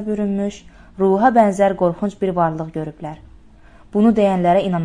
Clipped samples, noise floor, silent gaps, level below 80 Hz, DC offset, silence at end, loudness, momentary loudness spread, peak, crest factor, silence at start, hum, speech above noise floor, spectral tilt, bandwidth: under 0.1%; -45 dBFS; none; -46 dBFS; under 0.1%; 0 s; -17 LUFS; 14 LU; -2 dBFS; 16 dB; 0 s; none; 28 dB; -7.5 dB/octave; 10.5 kHz